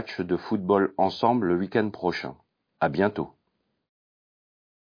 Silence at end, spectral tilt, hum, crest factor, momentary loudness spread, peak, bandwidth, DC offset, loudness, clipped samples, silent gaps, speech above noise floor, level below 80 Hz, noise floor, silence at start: 1.65 s; -8 dB/octave; none; 20 dB; 11 LU; -8 dBFS; 5.2 kHz; under 0.1%; -26 LUFS; under 0.1%; none; 50 dB; -62 dBFS; -76 dBFS; 0 s